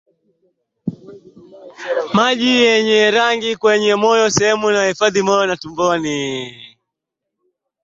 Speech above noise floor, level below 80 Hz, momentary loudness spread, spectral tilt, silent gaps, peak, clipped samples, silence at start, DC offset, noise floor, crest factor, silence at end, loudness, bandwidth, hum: 65 dB; -58 dBFS; 16 LU; -3.5 dB/octave; none; -2 dBFS; under 0.1%; 0.85 s; under 0.1%; -80 dBFS; 16 dB; 1.15 s; -15 LUFS; 8 kHz; none